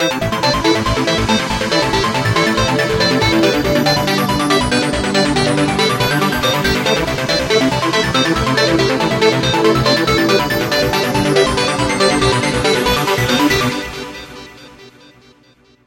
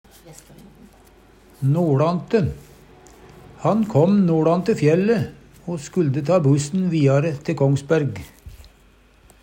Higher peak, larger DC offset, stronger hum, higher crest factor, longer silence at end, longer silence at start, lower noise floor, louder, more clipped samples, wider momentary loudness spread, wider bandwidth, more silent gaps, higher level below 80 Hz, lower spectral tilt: first, 0 dBFS vs -4 dBFS; neither; neither; about the same, 14 dB vs 16 dB; first, 1 s vs 0.85 s; second, 0 s vs 0.25 s; about the same, -50 dBFS vs -53 dBFS; first, -14 LUFS vs -20 LUFS; neither; second, 3 LU vs 11 LU; first, 17 kHz vs 10.5 kHz; neither; first, -34 dBFS vs -50 dBFS; second, -4 dB/octave vs -7.5 dB/octave